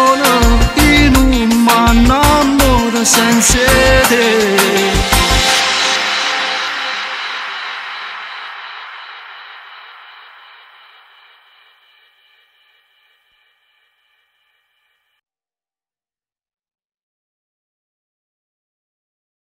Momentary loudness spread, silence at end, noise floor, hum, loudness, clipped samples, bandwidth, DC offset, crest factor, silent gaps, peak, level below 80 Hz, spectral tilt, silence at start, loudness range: 20 LU; 9.6 s; under -90 dBFS; none; -11 LUFS; under 0.1%; 16 kHz; under 0.1%; 14 dB; none; 0 dBFS; -24 dBFS; -3.5 dB/octave; 0 s; 20 LU